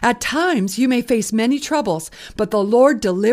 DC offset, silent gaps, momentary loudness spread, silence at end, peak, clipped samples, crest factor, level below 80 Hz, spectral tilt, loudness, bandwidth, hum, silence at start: under 0.1%; none; 9 LU; 0 s; -2 dBFS; under 0.1%; 16 dB; -48 dBFS; -4.5 dB/octave; -18 LUFS; 15.5 kHz; none; 0 s